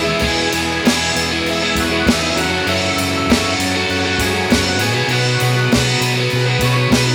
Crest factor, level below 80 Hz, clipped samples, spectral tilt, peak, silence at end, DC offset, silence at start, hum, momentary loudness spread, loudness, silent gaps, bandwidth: 16 dB; -34 dBFS; under 0.1%; -4 dB/octave; 0 dBFS; 0 s; under 0.1%; 0 s; none; 2 LU; -15 LUFS; none; 19.5 kHz